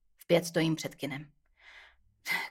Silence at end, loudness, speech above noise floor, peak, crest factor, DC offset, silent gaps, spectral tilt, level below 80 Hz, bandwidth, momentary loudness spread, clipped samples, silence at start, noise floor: 0 s; -32 LUFS; 28 dB; -12 dBFS; 22 dB; under 0.1%; none; -5 dB/octave; -70 dBFS; 16.5 kHz; 20 LU; under 0.1%; 0.3 s; -59 dBFS